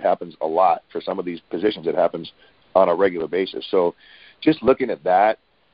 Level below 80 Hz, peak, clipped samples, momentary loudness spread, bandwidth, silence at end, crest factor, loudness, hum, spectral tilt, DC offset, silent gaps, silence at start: -58 dBFS; -2 dBFS; under 0.1%; 10 LU; 5.2 kHz; 0.4 s; 20 dB; -21 LUFS; none; -10.5 dB/octave; under 0.1%; none; 0 s